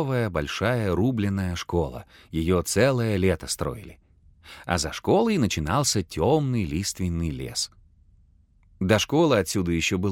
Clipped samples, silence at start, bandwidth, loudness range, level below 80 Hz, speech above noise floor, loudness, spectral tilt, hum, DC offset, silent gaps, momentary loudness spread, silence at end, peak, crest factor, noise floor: under 0.1%; 0 s; 17 kHz; 2 LU; -44 dBFS; 34 dB; -24 LUFS; -5 dB/octave; none; under 0.1%; none; 8 LU; 0 s; -4 dBFS; 20 dB; -58 dBFS